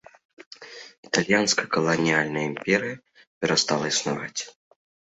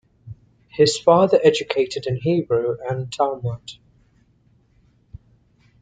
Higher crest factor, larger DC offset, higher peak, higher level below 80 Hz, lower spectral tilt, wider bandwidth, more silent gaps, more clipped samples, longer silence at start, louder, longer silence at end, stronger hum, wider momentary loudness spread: about the same, 24 dB vs 20 dB; neither; about the same, -2 dBFS vs -2 dBFS; second, -64 dBFS vs -56 dBFS; second, -3 dB/octave vs -5.5 dB/octave; second, 8.4 kHz vs 9.4 kHz; first, 0.46-0.51 s, 0.98-1.03 s, 3.27-3.41 s vs none; neither; first, 0.4 s vs 0.25 s; second, -24 LUFS vs -19 LUFS; second, 0.65 s vs 2.1 s; neither; first, 21 LU vs 15 LU